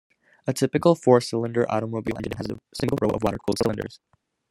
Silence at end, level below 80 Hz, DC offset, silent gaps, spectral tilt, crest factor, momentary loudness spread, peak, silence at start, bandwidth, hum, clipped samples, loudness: 0.55 s; -52 dBFS; under 0.1%; none; -6 dB/octave; 22 dB; 13 LU; -4 dBFS; 0.45 s; 16 kHz; none; under 0.1%; -24 LUFS